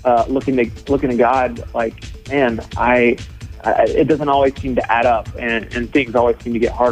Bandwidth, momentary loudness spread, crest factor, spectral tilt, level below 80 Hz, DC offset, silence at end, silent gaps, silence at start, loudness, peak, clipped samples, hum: 11 kHz; 8 LU; 14 dB; -6.5 dB/octave; -36 dBFS; under 0.1%; 0 s; none; 0 s; -17 LUFS; -2 dBFS; under 0.1%; none